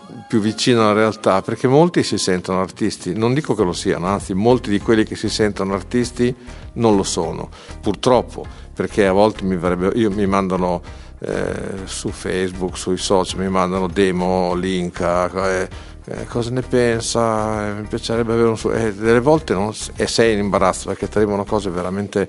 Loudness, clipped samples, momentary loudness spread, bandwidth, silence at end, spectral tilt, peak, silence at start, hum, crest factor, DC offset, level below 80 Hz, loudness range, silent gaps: -19 LUFS; under 0.1%; 10 LU; 11.5 kHz; 0 s; -5.5 dB/octave; 0 dBFS; 0 s; none; 18 dB; under 0.1%; -38 dBFS; 3 LU; none